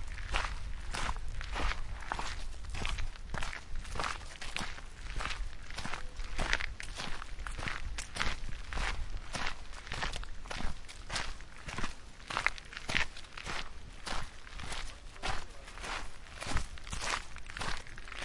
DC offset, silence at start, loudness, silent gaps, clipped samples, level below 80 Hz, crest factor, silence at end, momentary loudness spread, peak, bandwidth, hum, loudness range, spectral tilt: under 0.1%; 0 s; -40 LUFS; none; under 0.1%; -42 dBFS; 28 dB; 0 s; 10 LU; -8 dBFS; 11.5 kHz; none; 3 LU; -2.5 dB/octave